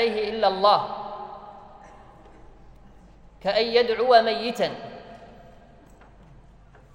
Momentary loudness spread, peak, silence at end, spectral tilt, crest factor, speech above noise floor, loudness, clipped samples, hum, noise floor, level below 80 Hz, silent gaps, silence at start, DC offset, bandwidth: 24 LU; -4 dBFS; 1.55 s; -4.5 dB/octave; 22 dB; 29 dB; -22 LUFS; under 0.1%; none; -51 dBFS; -54 dBFS; none; 0 s; under 0.1%; 16 kHz